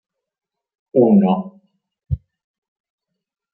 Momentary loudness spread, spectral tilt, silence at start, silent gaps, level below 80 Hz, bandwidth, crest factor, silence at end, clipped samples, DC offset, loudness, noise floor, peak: 15 LU; -13.5 dB/octave; 0.95 s; none; -44 dBFS; 3.2 kHz; 20 dB; 1.4 s; under 0.1%; under 0.1%; -16 LUFS; -56 dBFS; -2 dBFS